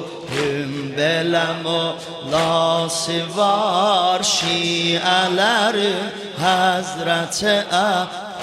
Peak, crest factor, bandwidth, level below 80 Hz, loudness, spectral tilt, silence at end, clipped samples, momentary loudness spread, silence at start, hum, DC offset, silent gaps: -4 dBFS; 16 dB; 16 kHz; -58 dBFS; -18 LUFS; -3 dB/octave; 0 s; under 0.1%; 7 LU; 0 s; none; under 0.1%; none